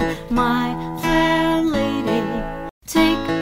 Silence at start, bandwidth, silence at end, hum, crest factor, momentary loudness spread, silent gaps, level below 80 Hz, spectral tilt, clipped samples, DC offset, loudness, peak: 0 s; 16 kHz; 0 s; none; 16 dB; 8 LU; 2.71-2.81 s; -36 dBFS; -5 dB/octave; under 0.1%; under 0.1%; -19 LUFS; -4 dBFS